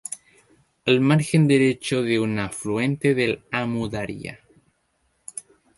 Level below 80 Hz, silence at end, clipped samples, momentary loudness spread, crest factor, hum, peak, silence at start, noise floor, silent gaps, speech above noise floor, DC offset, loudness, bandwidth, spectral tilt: -56 dBFS; 0.35 s; under 0.1%; 19 LU; 20 dB; none; -4 dBFS; 0.1 s; -69 dBFS; none; 48 dB; under 0.1%; -22 LUFS; 11.5 kHz; -6 dB/octave